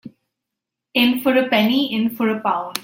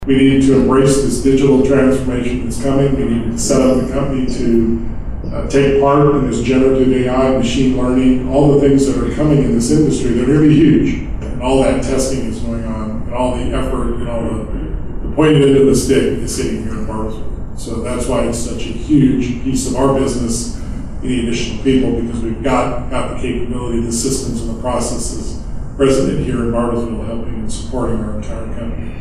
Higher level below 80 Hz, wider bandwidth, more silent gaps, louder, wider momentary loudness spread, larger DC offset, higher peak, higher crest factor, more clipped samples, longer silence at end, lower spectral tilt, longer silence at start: second, -64 dBFS vs -24 dBFS; first, 16.5 kHz vs 13.5 kHz; neither; second, -18 LUFS vs -15 LUFS; second, 6 LU vs 13 LU; neither; about the same, 0 dBFS vs -2 dBFS; first, 20 dB vs 12 dB; neither; about the same, 0 s vs 0 s; second, -4.5 dB/octave vs -6 dB/octave; about the same, 0.05 s vs 0 s